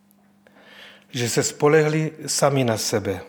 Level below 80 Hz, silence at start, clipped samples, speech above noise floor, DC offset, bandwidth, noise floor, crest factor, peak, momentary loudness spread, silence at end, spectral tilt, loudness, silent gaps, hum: -66 dBFS; 0.8 s; under 0.1%; 35 dB; under 0.1%; over 20 kHz; -56 dBFS; 20 dB; -4 dBFS; 7 LU; 0 s; -4.5 dB/octave; -21 LUFS; none; none